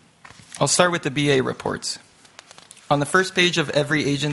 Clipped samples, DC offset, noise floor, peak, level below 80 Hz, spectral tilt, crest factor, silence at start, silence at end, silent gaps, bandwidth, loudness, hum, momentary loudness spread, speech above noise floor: under 0.1%; under 0.1%; -48 dBFS; -2 dBFS; -56 dBFS; -3.5 dB/octave; 22 dB; 0.55 s; 0 s; none; 11.5 kHz; -20 LUFS; none; 10 LU; 28 dB